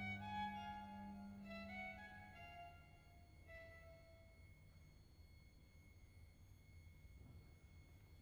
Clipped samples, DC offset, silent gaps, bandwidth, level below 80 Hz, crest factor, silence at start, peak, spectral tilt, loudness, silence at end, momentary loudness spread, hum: under 0.1%; under 0.1%; none; over 20 kHz; -68 dBFS; 18 dB; 0 s; -38 dBFS; -6 dB/octave; -56 LUFS; 0 s; 18 LU; none